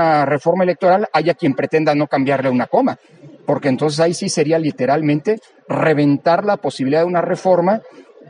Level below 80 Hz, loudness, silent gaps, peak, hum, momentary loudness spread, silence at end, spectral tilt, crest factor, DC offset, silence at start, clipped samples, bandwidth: -64 dBFS; -16 LUFS; none; -2 dBFS; none; 6 LU; 0.3 s; -6 dB/octave; 14 dB; under 0.1%; 0 s; under 0.1%; 10.5 kHz